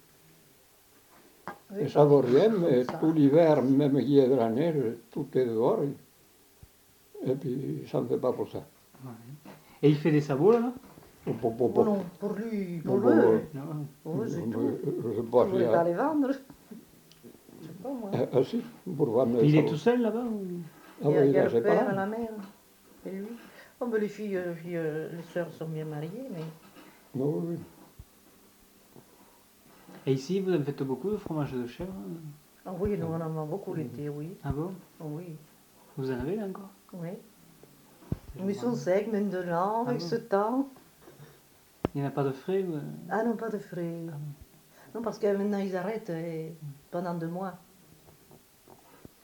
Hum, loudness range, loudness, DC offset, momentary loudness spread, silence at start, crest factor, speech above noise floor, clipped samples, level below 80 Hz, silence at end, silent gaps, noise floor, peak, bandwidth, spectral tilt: none; 12 LU; -29 LUFS; under 0.1%; 19 LU; 1.45 s; 22 dB; 32 dB; under 0.1%; -60 dBFS; 1.65 s; none; -60 dBFS; -8 dBFS; 19 kHz; -8 dB/octave